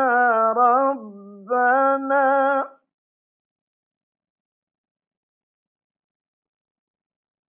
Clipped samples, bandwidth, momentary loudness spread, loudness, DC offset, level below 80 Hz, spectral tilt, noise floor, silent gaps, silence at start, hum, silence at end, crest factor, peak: under 0.1%; 3.6 kHz; 8 LU; -19 LUFS; under 0.1%; under -90 dBFS; -8 dB/octave; -39 dBFS; none; 0 s; none; 4.8 s; 16 dB; -6 dBFS